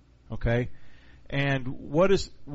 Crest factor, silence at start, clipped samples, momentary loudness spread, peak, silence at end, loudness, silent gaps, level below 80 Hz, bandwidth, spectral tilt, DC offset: 18 dB; 0.3 s; under 0.1%; 11 LU; -10 dBFS; 0 s; -27 LUFS; none; -40 dBFS; 8 kHz; -5.5 dB/octave; under 0.1%